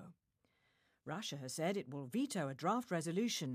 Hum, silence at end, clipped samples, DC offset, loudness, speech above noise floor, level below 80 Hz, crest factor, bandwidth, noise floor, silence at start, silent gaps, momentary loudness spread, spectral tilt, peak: none; 0 s; under 0.1%; under 0.1%; -40 LUFS; 41 dB; -86 dBFS; 18 dB; 15 kHz; -81 dBFS; 0 s; none; 7 LU; -4.5 dB/octave; -24 dBFS